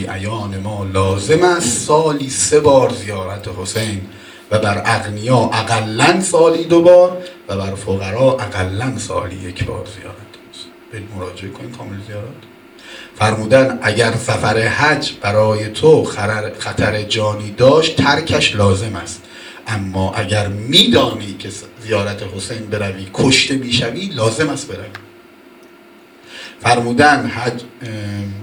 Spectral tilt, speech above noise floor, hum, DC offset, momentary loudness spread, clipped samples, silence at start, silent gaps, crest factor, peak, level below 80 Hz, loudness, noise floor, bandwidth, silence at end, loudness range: -4.5 dB/octave; 28 dB; none; under 0.1%; 19 LU; under 0.1%; 0 s; none; 16 dB; 0 dBFS; -46 dBFS; -15 LUFS; -43 dBFS; 19.5 kHz; 0 s; 8 LU